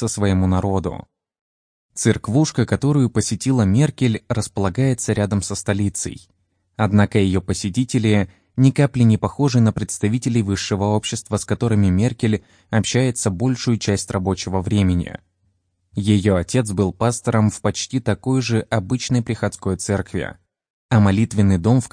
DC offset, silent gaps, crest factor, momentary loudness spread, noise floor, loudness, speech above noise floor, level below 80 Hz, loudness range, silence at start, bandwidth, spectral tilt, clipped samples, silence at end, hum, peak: under 0.1%; 1.41-1.89 s, 20.70-20.89 s; 16 dB; 7 LU; -66 dBFS; -19 LUFS; 48 dB; -46 dBFS; 3 LU; 0 s; 10.5 kHz; -6 dB/octave; under 0.1%; 0.05 s; none; -2 dBFS